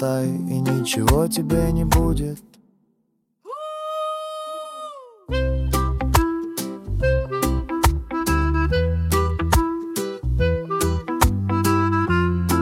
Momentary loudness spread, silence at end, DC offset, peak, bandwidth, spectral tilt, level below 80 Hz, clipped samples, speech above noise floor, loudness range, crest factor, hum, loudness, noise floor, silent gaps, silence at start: 11 LU; 0 s; under 0.1%; -2 dBFS; 17 kHz; -5.5 dB/octave; -28 dBFS; under 0.1%; 49 dB; 6 LU; 20 dB; none; -22 LUFS; -69 dBFS; none; 0 s